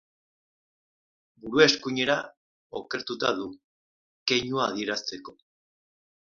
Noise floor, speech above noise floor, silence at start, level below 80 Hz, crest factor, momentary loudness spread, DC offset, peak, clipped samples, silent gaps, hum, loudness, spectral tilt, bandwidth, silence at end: under -90 dBFS; over 63 dB; 1.45 s; -68 dBFS; 26 dB; 19 LU; under 0.1%; -2 dBFS; under 0.1%; 2.37-2.70 s, 3.64-4.26 s; none; -26 LUFS; -3.5 dB/octave; 7.2 kHz; 1 s